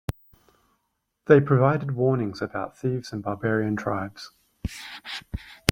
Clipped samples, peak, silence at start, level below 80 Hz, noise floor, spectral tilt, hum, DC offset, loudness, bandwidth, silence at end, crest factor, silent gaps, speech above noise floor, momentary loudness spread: under 0.1%; 0 dBFS; 0.1 s; -48 dBFS; -76 dBFS; -6.5 dB/octave; none; under 0.1%; -25 LUFS; 16.5 kHz; 0 s; 26 dB; none; 52 dB; 18 LU